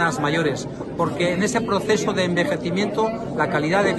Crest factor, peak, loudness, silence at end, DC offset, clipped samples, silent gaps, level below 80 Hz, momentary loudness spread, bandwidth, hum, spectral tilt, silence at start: 14 dB; -6 dBFS; -22 LUFS; 0 s; under 0.1%; under 0.1%; none; -50 dBFS; 5 LU; 12.5 kHz; none; -5 dB/octave; 0 s